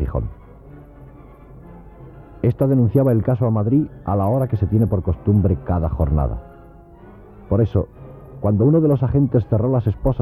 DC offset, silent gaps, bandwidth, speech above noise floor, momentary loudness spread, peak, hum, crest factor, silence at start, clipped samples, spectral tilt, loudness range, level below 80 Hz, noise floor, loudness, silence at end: under 0.1%; none; 12.5 kHz; 26 dB; 9 LU; -4 dBFS; none; 14 dB; 0 s; under 0.1%; -12 dB/octave; 4 LU; -32 dBFS; -43 dBFS; -19 LUFS; 0 s